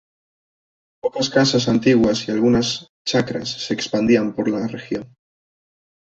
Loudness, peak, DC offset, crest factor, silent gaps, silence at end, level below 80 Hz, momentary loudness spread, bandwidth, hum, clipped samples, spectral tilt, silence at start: -19 LUFS; -2 dBFS; under 0.1%; 18 dB; 2.89-3.05 s; 0.95 s; -52 dBFS; 10 LU; 8 kHz; none; under 0.1%; -5 dB/octave; 1.05 s